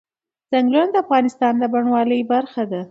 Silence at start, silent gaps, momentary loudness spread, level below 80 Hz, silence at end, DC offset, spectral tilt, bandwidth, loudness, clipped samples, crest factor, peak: 0.5 s; none; 5 LU; -72 dBFS; 0.05 s; under 0.1%; -6.5 dB/octave; 7.8 kHz; -18 LUFS; under 0.1%; 14 dB; -4 dBFS